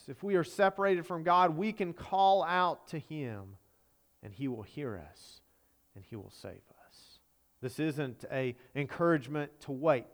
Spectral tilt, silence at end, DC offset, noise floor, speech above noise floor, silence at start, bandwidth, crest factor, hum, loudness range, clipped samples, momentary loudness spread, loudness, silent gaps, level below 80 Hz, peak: -6.5 dB/octave; 0.1 s; under 0.1%; -70 dBFS; 38 dB; 0.1 s; over 20 kHz; 20 dB; none; 15 LU; under 0.1%; 21 LU; -32 LUFS; none; -70 dBFS; -14 dBFS